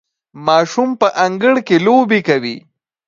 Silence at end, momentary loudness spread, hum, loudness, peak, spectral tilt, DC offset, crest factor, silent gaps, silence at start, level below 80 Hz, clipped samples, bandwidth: 0.5 s; 9 LU; none; -14 LUFS; 0 dBFS; -5.5 dB/octave; under 0.1%; 14 dB; none; 0.35 s; -64 dBFS; under 0.1%; 7.6 kHz